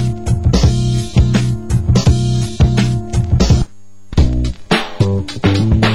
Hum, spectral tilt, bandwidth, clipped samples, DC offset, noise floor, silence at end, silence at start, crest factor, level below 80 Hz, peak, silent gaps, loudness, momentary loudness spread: none; -6.5 dB/octave; 12 kHz; under 0.1%; 3%; -34 dBFS; 0 s; 0 s; 12 dB; -20 dBFS; 0 dBFS; none; -15 LUFS; 5 LU